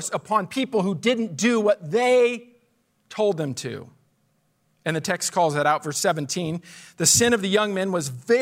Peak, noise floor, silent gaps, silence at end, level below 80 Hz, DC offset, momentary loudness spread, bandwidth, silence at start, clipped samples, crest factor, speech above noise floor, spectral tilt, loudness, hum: -6 dBFS; -67 dBFS; none; 0 s; -64 dBFS; under 0.1%; 13 LU; 16 kHz; 0 s; under 0.1%; 18 dB; 45 dB; -3.5 dB/octave; -22 LUFS; none